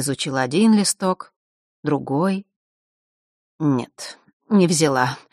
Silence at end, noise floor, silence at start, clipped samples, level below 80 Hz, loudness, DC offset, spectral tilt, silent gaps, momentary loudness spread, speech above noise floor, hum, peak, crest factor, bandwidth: 0.15 s; under -90 dBFS; 0 s; under 0.1%; -64 dBFS; -20 LUFS; under 0.1%; -5 dB/octave; 1.36-1.83 s, 2.56-3.59 s, 4.33-4.40 s; 14 LU; over 71 dB; none; -4 dBFS; 18 dB; 13.5 kHz